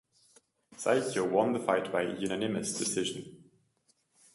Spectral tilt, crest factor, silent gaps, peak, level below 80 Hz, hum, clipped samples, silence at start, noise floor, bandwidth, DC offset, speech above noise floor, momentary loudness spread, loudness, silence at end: -4 dB/octave; 20 dB; none; -12 dBFS; -70 dBFS; none; under 0.1%; 0.7 s; -73 dBFS; 11.5 kHz; under 0.1%; 42 dB; 7 LU; -31 LUFS; 0.95 s